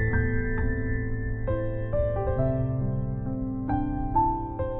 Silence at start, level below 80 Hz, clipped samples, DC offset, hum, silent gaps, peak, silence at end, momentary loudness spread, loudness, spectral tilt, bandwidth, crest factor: 0 s; -32 dBFS; under 0.1%; under 0.1%; none; none; -10 dBFS; 0 s; 6 LU; -28 LUFS; -9.5 dB/octave; 3.4 kHz; 16 dB